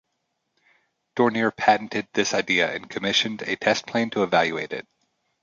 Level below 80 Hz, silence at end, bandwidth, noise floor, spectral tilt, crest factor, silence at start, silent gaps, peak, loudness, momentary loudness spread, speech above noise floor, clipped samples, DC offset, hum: -66 dBFS; 0.6 s; 7.6 kHz; -76 dBFS; -3.5 dB/octave; 20 dB; 1.15 s; none; -4 dBFS; -23 LUFS; 7 LU; 53 dB; under 0.1%; under 0.1%; none